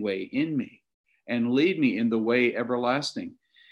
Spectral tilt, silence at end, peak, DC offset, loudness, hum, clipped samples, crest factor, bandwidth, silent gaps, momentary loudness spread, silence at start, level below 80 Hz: -5.5 dB/octave; 0.4 s; -12 dBFS; under 0.1%; -26 LUFS; none; under 0.1%; 16 dB; 11 kHz; 0.94-1.04 s; 10 LU; 0 s; -74 dBFS